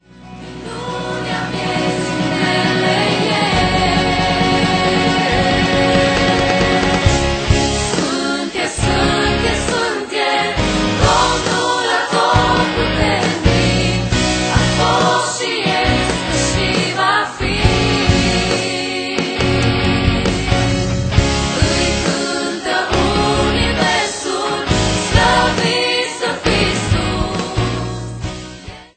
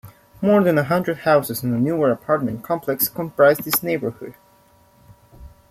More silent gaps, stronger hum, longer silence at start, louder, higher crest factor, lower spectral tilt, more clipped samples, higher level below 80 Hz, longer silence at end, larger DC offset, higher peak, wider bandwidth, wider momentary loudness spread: neither; neither; about the same, 0.15 s vs 0.05 s; first, -15 LUFS vs -19 LUFS; about the same, 16 dB vs 18 dB; about the same, -4.5 dB/octave vs -5.5 dB/octave; neither; first, -28 dBFS vs -54 dBFS; second, 0.1 s vs 0.25 s; neither; first, 0 dBFS vs -4 dBFS; second, 9.2 kHz vs 16 kHz; second, 6 LU vs 9 LU